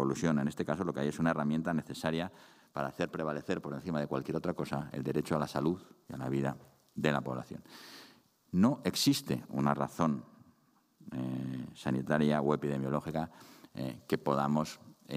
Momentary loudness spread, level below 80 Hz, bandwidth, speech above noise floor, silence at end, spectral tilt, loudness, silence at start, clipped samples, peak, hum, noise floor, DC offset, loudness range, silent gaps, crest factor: 14 LU; -66 dBFS; 15.5 kHz; 36 dB; 0 s; -6 dB/octave; -34 LUFS; 0 s; under 0.1%; -12 dBFS; none; -70 dBFS; under 0.1%; 3 LU; none; 22 dB